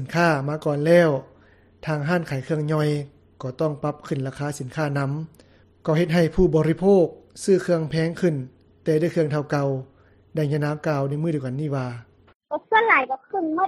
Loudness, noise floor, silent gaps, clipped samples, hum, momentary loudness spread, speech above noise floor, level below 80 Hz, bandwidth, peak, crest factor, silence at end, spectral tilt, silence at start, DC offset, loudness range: -23 LUFS; -54 dBFS; 12.35-12.40 s; under 0.1%; none; 14 LU; 32 dB; -46 dBFS; 13.5 kHz; -2 dBFS; 20 dB; 0 s; -7 dB/octave; 0 s; under 0.1%; 5 LU